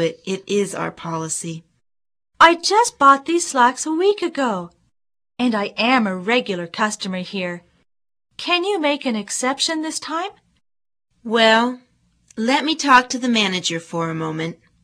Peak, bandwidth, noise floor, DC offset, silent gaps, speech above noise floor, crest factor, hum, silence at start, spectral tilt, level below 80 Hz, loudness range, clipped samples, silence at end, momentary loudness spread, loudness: 0 dBFS; 14 kHz; -56 dBFS; under 0.1%; none; 37 dB; 20 dB; none; 0 s; -3 dB/octave; -62 dBFS; 6 LU; under 0.1%; 0.3 s; 14 LU; -19 LUFS